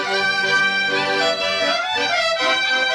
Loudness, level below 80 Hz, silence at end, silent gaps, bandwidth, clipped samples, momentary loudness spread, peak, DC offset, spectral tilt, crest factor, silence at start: -18 LUFS; -60 dBFS; 0 s; none; 13.5 kHz; under 0.1%; 2 LU; -6 dBFS; under 0.1%; -1.5 dB/octave; 14 dB; 0 s